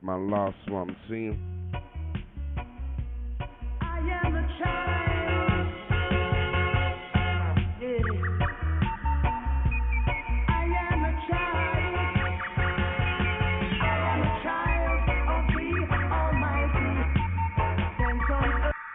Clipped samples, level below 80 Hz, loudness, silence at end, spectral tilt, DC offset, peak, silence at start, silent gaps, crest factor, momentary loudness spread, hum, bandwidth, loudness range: under 0.1%; -32 dBFS; -28 LUFS; 0 s; -10.5 dB/octave; under 0.1%; -12 dBFS; 0 s; none; 14 dB; 10 LU; none; 3.9 kHz; 7 LU